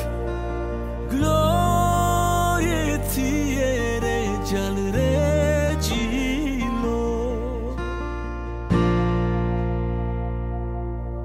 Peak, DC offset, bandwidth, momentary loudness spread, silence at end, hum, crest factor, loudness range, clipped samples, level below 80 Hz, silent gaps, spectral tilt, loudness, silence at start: -8 dBFS; under 0.1%; 16 kHz; 9 LU; 0 s; none; 14 dB; 4 LU; under 0.1%; -30 dBFS; none; -6 dB/octave; -23 LUFS; 0 s